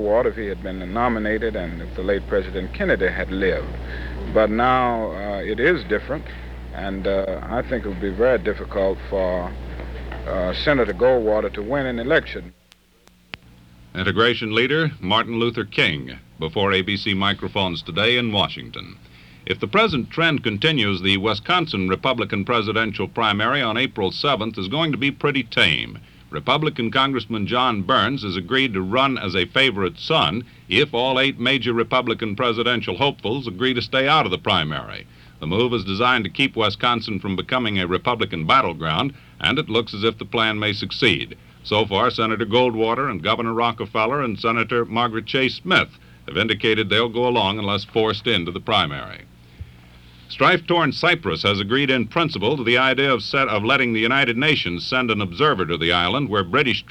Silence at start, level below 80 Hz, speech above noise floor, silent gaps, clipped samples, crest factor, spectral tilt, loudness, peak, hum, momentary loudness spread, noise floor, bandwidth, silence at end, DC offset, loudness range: 0 s; -40 dBFS; 34 dB; none; under 0.1%; 18 dB; -6 dB/octave; -20 LUFS; -2 dBFS; none; 10 LU; -55 dBFS; 13 kHz; 0.1 s; under 0.1%; 4 LU